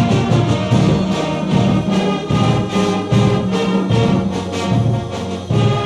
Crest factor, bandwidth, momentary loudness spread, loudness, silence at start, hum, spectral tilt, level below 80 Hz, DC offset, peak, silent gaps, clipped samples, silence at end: 14 dB; 11 kHz; 5 LU; -16 LUFS; 0 s; none; -7 dB/octave; -38 dBFS; under 0.1%; -2 dBFS; none; under 0.1%; 0 s